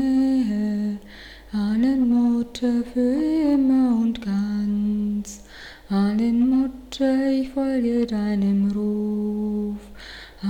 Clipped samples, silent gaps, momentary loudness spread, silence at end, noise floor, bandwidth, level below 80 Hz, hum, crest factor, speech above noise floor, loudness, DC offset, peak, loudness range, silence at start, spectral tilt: under 0.1%; none; 16 LU; 0 s; -42 dBFS; 10 kHz; -48 dBFS; none; 10 dB; 22 dB; -22 LUFS; under 0.1%; -10 dBFS; 2 LU; 0 s; -7 dB/octave